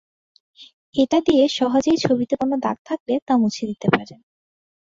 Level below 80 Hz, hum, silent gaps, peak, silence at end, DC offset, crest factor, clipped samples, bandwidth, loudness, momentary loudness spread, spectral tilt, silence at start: -58 dBFS; none; 0.73-0.93 s, 2.79-2.85 s, 3.00-3.06 s, 3.22-3.27 s; -2 dBFS; 0.75 s; under 0.1%; 20 dB; under 0.1%; 7.8 kHz; -20 LUFS; 7 LU; -5.5 dB/octave; 0.6 s